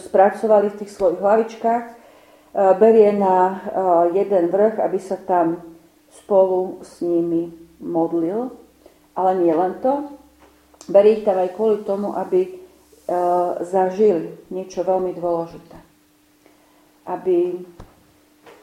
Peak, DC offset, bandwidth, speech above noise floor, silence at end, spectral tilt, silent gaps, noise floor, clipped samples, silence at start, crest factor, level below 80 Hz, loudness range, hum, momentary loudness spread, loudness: -2 dBFS; under 0.1%; 12.5 kHz; 38 dB; 0.8 s; -7.5 dB/octave; none; -57 dBFS; under 0.1%; 0 s; 18 dB; -60 dBFS; 7 LU; none; 14 LU; -19 LUFS